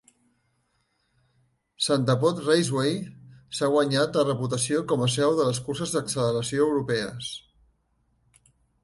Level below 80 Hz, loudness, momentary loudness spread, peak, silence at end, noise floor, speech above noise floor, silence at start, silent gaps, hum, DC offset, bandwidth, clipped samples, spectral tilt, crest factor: -62 dBFS; -25 LUFS; 11 LU; -8 dBFS; 1.45 s; -72 dBFS; 47 dB; 1.8 s; none; none; under 0.1%; 11.5 kHz; under 0.1%; -5 dB/octave; 18 dB